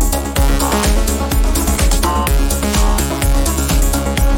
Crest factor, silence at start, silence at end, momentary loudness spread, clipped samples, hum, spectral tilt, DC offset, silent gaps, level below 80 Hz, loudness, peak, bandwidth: 12 dB; 0 s; 0 s; 2 LU; under 0.1%; none; -4.5 dB/octave; under 0.1%; none; -16 dBFS; -15 LUFS; -2 dBFS; 17.5 kHz